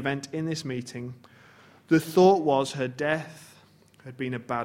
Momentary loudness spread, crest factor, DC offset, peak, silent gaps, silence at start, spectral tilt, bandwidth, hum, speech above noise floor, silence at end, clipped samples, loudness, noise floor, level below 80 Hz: 19 LU; 20 dB; under 0.1%; -6 dBFS; none; 0 s; -6 dB/octave; 16.5 kHz; none; 31 dB; 0 s; under 0.1%; -26 LUFS; -57 dBFS; -66 dBFS